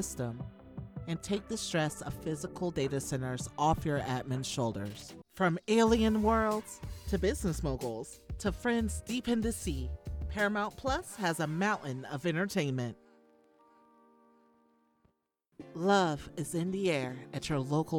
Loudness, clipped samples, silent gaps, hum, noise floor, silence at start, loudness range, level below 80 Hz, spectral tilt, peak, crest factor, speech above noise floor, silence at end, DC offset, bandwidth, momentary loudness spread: -33 LUFS; under 0.1%; none; none; -77 dBFS; 0 s; 6 LU; -48 dBFS; -5.5 dB/octave; -14 dBFS; 20 dB; 44 dB; 0 s; under 0.1%; 19 kHz; 13 LU